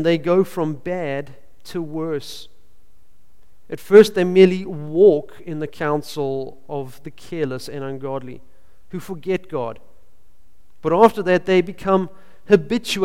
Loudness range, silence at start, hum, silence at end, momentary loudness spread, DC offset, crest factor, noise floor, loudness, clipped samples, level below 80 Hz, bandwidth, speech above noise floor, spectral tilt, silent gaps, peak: 12 LU; 0 s; none; 0 s; 19 LU; 2%; 20 dB; -57 dBFS; -19 LUFS; under 0.1%; -54 dBFS; 15.5 kHz; 38 dB; -6.5 dB/octave; none; 0 dBFS